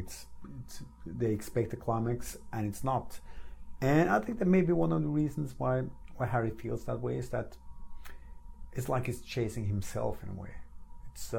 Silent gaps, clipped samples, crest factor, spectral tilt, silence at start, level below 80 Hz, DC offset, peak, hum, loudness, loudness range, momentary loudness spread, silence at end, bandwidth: none; under 0.1%; 18 dB; -7 dB/octave; 0 s; -48 dBFS; under 0.1%; -14 dBFS; none; -33 LUFS; 7 LU; 21 LU; 0 s; 17 kHz